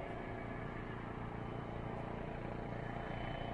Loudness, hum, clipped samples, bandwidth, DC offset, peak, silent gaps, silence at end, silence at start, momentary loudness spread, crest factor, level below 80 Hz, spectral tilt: -45 LUFS; none; under 0.1%; 10.5 kHz; under 0.1%; -30 dBFS; none; 0 s; 0 s; 2 LU; 14 dB; -52 dBFS; -8 dB/octave